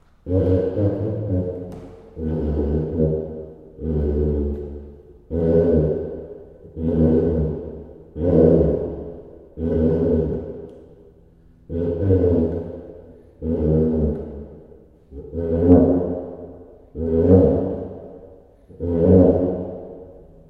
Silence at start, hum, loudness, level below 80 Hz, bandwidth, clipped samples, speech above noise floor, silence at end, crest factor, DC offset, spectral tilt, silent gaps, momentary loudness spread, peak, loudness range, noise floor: 0.25 s; none; -20 LUFS; -34 dBFS; 3.7 kHz; under 0.1%; 30 dB; 0.3 s; 20 dB; under 0.1%; -12.5 dB/octave; none; 23 LU; 0 dBFS; 5 LU; -50 dBFS